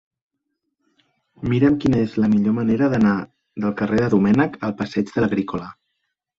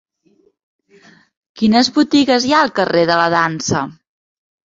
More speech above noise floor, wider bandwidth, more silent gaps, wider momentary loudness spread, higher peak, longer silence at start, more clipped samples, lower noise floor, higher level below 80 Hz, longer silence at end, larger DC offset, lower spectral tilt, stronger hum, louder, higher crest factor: first, 58 dB vs 43 dB; about the same, 7.4 kHz vs 7.8 kHz; neither; first, 10 LU vs 7 LU; second, -4 dBFS vs 0 dBFS; second, 1.4 s vs 1.55 s; neither; first, -77 dBFS vs -57 dBFS; about the same, -48 dBFS vs -52 dBFS; second, 0.65 s vs 0.8 s; neither; first, -8.5 dB/octave vs -4 dB/octave; neither; second, -20 LUFS vs -14 LUFS; about the same, 16 dB vs 16 dB